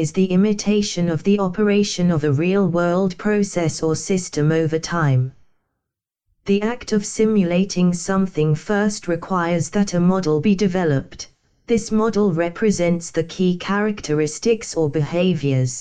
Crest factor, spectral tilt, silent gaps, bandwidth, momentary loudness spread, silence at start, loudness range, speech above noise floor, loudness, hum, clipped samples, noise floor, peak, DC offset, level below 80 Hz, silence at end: 12 dB; -6 dB/octave; none; 9.6 kHz; 4 LU; 0 s; 3 LU; 63 dB; -19 LUFS; none; under 0.1%; -82 dBFS; -8 dBFS; under 0.1%; -48 dBFS; 0 s